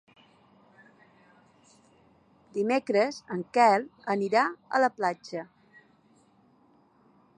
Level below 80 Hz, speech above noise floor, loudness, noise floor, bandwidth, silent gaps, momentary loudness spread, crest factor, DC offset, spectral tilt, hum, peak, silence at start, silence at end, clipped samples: -80 dBFS; 36 dB; -27 LUFS; -63 dBFS; 10.5 kHz; none; 15 LU; 22 dB; under 0.1%; -5 dB/octave; none; -8 dBFS; 2.55 s; 1.95 s; under 0.1%